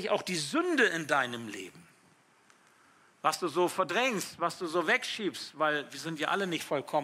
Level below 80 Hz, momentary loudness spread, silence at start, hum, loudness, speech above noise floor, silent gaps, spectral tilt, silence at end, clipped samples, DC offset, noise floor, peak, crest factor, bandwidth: -82 dBFS; 9 LU; 0 s; none; -30 LUFS; 33 dB; none; -3.5 dB/octave; 0 s; under 0.1%; under 0.1%; -64 dBFS; -12 dBFS; 20 dB; 16 kHz